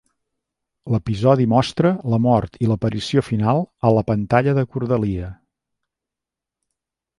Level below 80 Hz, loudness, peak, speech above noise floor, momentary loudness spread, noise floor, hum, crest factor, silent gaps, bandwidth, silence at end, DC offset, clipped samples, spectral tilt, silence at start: -44 dBFS; -19 LUFS; -2 dBFS; 68 dB; 6 LU; -87 dBFS; none; 18 dB; none; 11.5 kHz; 1.85 s; under 0.1%; under 0.1%; -8 dB/octave; 0.85 s